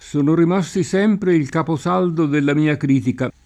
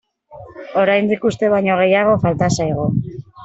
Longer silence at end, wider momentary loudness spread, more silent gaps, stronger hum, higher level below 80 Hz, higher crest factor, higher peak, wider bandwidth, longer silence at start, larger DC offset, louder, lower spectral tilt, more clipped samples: first, 0.15 s vs 0 s; second, 4 LU vs 9 LU; neither; neither; second, -52 dBFS vs -46 dBFS; about the same, 12 dB vs 14 dB; second, -6 dBFS vs -2 dBFS; first, 11 kHz vs 8.2 kHz; second, 0.05 s vs 0.3 s; neither; about the same, -18 LUFS vs -16 LUFS; about the same, -7 dB/octave vs -6 dB/octave; neither